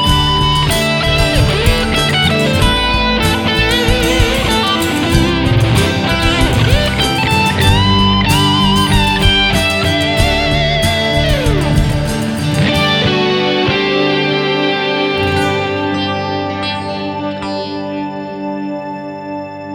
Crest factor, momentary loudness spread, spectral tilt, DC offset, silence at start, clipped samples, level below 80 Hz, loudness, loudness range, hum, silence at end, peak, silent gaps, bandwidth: 12 dB; 10 LU; -5 dB/octave; under 0.1%; 0 s; under 0.1%; -22 dBFS; -13 LUFS; 6 LU; none; 0 s; 0 dBFS; none; 19.5 kHz